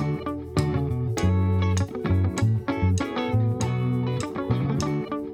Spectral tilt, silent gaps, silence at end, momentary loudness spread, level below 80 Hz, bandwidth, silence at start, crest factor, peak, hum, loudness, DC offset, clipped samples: -7 dB/octave; none; 0 s; 5 LU; -42 dBFS; 11 kHz; 0 s; 16 dB; -8 dBFS; none; -25 LUFS; under 0.1%; under 0.1%